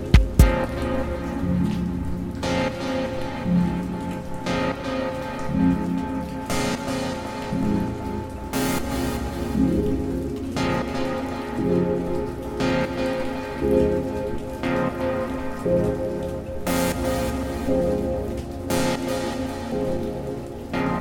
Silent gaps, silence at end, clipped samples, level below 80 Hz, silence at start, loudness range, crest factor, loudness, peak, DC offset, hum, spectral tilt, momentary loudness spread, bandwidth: none; 0 s; under 0.1%; -32 dBFS; 0 s; 2 LU; 22 dB; -25 LUFS; 0 dBFS; under 0.1%; none; -6.5 dB/octave; 8 LU; 19 kHz